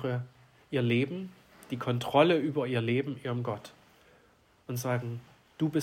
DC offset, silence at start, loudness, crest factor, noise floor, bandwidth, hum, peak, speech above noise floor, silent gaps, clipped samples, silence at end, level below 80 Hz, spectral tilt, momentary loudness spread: under 0.1%; 0 s; -31 LUFS; 22 dB; -64 dBFS; 16 kHz; none; -10 dBFS; 34 dB; none; under 0.1%; 0 s; -72 dBFS; -6.5 dB/octave; 18 LU